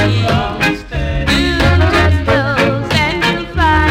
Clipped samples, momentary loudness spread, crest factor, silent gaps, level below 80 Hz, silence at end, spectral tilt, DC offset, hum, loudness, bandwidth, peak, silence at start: under 0.1%; 5 LU; 10 dB; none; -22 dBFS; 0 s; -5.5 dB/octave; under 0.1%; none; -13 LUFS; 15 kHz; -2 dBFS; 0 s